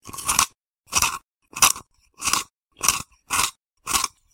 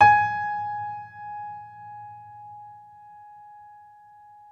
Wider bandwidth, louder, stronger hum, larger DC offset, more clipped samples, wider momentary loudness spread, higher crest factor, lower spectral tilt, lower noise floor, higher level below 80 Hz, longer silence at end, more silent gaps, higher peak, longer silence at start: first, over 20 kHz vs 6.4 kHz; first, -22 LUFS vs -26 LUFS; neither; neither; neither; second, 13 LU vs 23 LU; about the same, 24 dB vs 24 dB; second, 0.5 dB/octave vs -5 dB/octave; second, -44 dBFS vs -50 dBFS; first, -50 dBFS vs -64 dBFS; second, 0.25 s vs 1.75 s; first, 0.79-0.84 s, 1.34-1.38 s, 2.62-2.67 s vs none; first, 0 dBFS vs -4 dBFS; about the same, 0.05 s vs 0 s